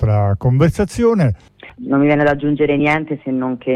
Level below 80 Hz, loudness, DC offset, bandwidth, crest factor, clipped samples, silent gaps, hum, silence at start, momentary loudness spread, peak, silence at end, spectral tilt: -36 dBFS; -16 LUFS; under 0.1%; 12.5 kHz; 12 dB; under 0.1%; none; none; 0 s; 7 LU; -4 dBFS; 0 s; -8 dB/octave